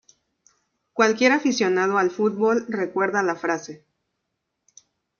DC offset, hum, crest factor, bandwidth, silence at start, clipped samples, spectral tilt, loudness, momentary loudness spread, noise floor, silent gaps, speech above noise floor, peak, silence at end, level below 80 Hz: under 0.1%; none; 20 dB; 7.2 kHz; 0.95 s; under 0.1%; -4 dB/octave; -21 LUFS; 9 LU; -79 dBFS; none; 57 dB; -4 dBFS; 1.45 s; -72 dBFS